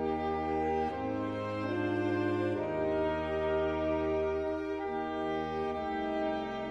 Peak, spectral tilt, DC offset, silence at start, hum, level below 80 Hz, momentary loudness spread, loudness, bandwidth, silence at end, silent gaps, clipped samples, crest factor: -20 dBFS; -7.5 dB/octave; under 0.1%; 0 s; none; -52 dBFS; 4 LU; -33 LUFS; 8.4 kHz; 0 s; none; under 0.1%; 12 dB